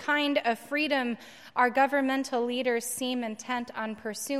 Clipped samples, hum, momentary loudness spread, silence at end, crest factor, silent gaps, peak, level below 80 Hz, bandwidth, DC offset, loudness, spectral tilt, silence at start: under 0.1%; none; 10 LU; 0 s; 18 dB; none; -10 dBFS; -78 dBFS; 16 kHz; under 0.1%; -28 LUFS; -2.5 dB/octave; 0 s